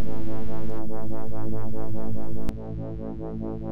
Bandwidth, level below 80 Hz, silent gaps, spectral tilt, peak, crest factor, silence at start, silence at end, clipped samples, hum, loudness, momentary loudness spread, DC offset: 19.5 kHz; -42 dBFS; none; -9 dB/octave; -10 dBFS; 8 dB; 0 s; 0 s; under 0.1%; none; -34 LUFS; 1 LU; 20%